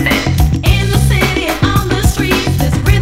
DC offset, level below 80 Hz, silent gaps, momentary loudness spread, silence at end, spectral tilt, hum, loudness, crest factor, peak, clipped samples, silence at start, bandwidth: under 0.1%; -18 dBFS; none; 2 LU; 0 s; -5 dB/octave; none; -13 LUFS; 12 dB; 0 dBFS; 0.3%; 0 s; 16.5 kHz